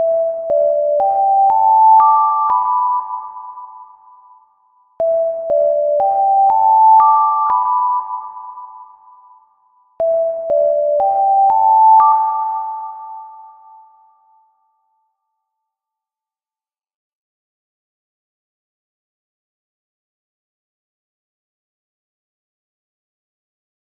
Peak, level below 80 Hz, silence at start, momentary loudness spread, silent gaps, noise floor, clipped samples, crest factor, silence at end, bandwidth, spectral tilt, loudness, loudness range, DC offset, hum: -2 dBFS; -64 dBFS; 0 s; 21 LU; none; under -90 dBFS; under 0.1%; 16 dB; 10.55 s; 2.4 kHz; -8 dB/octave; -13 LUFS; 7 LU; under 0.1%; none